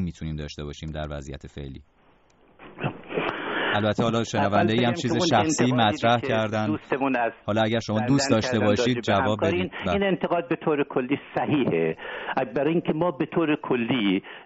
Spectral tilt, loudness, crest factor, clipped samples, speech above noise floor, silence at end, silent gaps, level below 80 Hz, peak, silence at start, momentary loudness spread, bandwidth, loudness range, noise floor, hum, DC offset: -4.5 dB/octave; -24 LUFS; 18 dB; under 0.1%; 35 dB; 0 s; none; -50 dBFS; -6 dBFS; 0 s; 12 LU; 8 kHz; 6 LU; -59 dBFS; none; under 0.1%